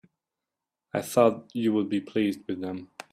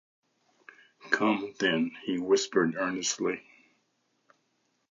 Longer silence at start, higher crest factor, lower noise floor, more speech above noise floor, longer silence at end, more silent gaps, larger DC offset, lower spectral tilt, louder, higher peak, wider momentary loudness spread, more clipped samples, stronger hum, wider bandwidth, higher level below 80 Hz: about the same, 0.95 s vs 1.05 s; about the same, 20 dB vs 22 dB; first, -88 dBFS vs -75 dBFS; first, 61 dB vs 46 dB; second, 0.25 s vs 1.5 s; neither; neither; first, -6 dB/octave vs -3.5 dB/octave; about the same, -27 LUFS vs -29 LUFS; about the same, -8 dBFS vs -10 dBFS; first, 12 LU vs 6 LU; neither; neither; first, 15.5 kHz vs 7.6 kHz; about the same, -72 dBFS vs -76 dBFS